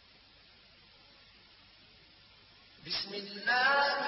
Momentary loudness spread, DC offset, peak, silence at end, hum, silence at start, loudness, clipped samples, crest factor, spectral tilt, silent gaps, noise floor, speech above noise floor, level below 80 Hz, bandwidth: 13 LU; under 0.1%; -18 dBFS; 0 s; none; 2.85 s; -30 LUFS; under 0.1%; 20 dB; -5 dB/octave; none; -60 dBFS; 30 dB; -72 dBFS; 6 kHz